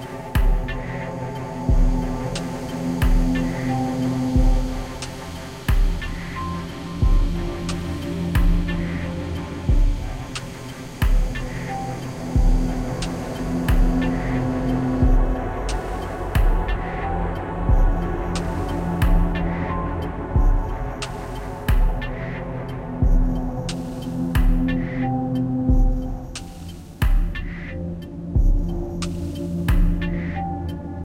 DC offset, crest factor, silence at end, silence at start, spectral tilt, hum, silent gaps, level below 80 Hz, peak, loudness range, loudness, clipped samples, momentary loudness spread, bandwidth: under 0.1%; 14 dB; 0 s; 0 s; -7 dB/octave; none; none; -22 dBFS; -6 dBFS; 3 LU; -25 LUFS; under 0.1%; 9 LU; 16 kHz